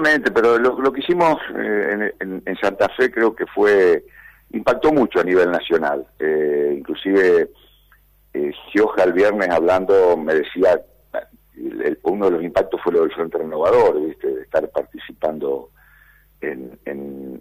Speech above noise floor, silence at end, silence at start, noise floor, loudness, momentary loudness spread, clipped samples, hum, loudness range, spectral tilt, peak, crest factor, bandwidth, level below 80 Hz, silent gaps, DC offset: 36 dB; 0.05 s; 0 s; -54 dBFS; -18 LUFS; 15 LU; under 0.1%; none; 3 LU; -6 dB/octave; -6 dBFS; 12 dB; 15.5 kHz; -52 dBFS; none; under 0.1%